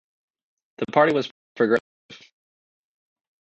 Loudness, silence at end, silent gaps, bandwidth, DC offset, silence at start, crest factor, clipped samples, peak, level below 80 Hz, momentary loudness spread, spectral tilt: -22 LUFS; 1.25 s; 1.31-1.55 s, 1.80-2.09 s; 8.2 kHz; under 0.1%; 0.8 s; 24 dB; under 0.1%; -2 dBFS; -70 dBFS; 13 LU; -6.5 dB/octave